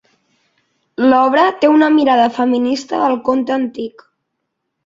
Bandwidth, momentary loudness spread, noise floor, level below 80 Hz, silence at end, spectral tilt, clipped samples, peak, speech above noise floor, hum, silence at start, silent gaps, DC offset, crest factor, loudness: 7.8 kHz; 11 LU; -73 dBFS; -60 dBFS; 0.95 s; -4.5 dB/octave; under 0.1%; -2 dBFS; 60 dB; none; 1 s; none; under 0.1%; 14 dB; -14 LUFS